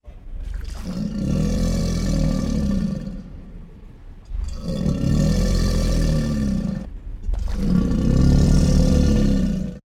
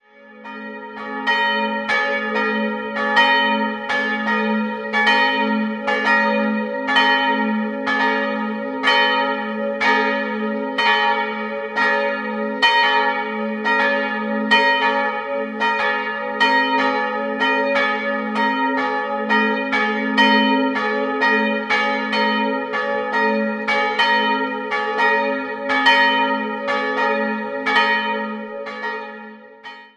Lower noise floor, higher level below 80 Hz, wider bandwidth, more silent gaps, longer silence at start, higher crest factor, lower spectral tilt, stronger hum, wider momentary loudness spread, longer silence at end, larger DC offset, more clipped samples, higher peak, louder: about the same, -40 dBFS vs -40 dBFS; first, -24 dBFS vs -66 dBFS; first, 14 kHz vs 10.5 kHz; neither; second, 0.05 s vs 0.25 s; about the same, 16 dB vs 18 dB; first, -7 dB/octave vs -4.5 dB/octave; neither; first, 17 LU vs 9 LU; about the same, 0.1 s vs 0.1 s; neither; neither; about the same, -4 dBFS vs -2 dBFS; second, -21 LUFS vs -18 LUFS